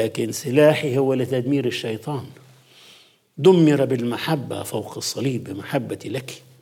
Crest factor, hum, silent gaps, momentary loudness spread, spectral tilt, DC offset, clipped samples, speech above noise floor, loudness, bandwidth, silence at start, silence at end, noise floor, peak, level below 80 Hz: 18 dB; none; none; 14 LU; -6 dB/octave; under 0.1%; under 0.1%; 31 dB; -21 LUFS; 16.5 kHz; 0 s; 0.25 s; -52 dBFS; -2 dBFS; -72 dBFS